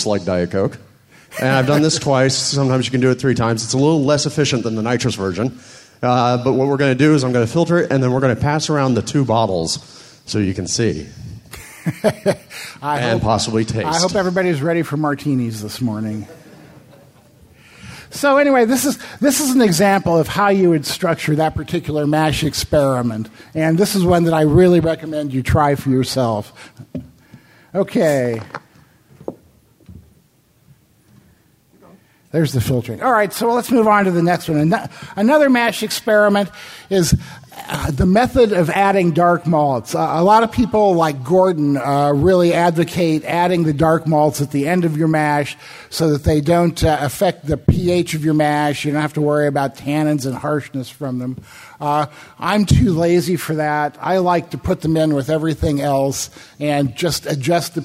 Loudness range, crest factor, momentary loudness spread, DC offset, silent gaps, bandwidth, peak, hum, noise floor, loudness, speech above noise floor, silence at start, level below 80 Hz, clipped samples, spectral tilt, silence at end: 7 LU; 16 dB; 12 LU; under 0.1%; none; 16 kHz; 0 dBFS; none; -56 dBFS; -17 LUFS; 39 dB; 0 s; -40 dBFS; under 0.1%; -5.5 dB/octave; 0 s